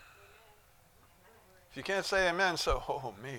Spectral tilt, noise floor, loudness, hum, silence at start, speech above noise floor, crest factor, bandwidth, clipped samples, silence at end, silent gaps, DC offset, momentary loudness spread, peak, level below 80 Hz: -3 dB/octave; -63 dBFS; -32 LUFS; none; 0 s; 30 dB; 20 dB; 19 kHz; under 0.1%; 0 s; none; under 0.1%; 12 LU; -16 dBFS; -48 dBFS